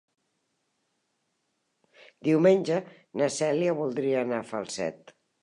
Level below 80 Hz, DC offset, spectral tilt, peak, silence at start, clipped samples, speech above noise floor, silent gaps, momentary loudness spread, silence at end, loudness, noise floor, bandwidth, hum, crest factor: -78 dBFS; under 0.1%; -5.5 dB/octave; -10 dBFS; 2.25 s; under 0.1%; 51 dB; none; 12 LU; 0.45 s; -27 LUFS; -77 dBFS; 11 kHz; none; 20 dB